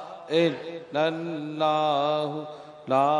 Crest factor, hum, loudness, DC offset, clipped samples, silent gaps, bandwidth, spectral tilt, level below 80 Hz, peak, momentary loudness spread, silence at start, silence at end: 16 dB; none; -26 LUFS; under 0.1%; under 0.1%; none; 10.5 kHz; -6 dB/octave; -78 dBFS; -10 dBFS; 12 LU; 0 s; 0 s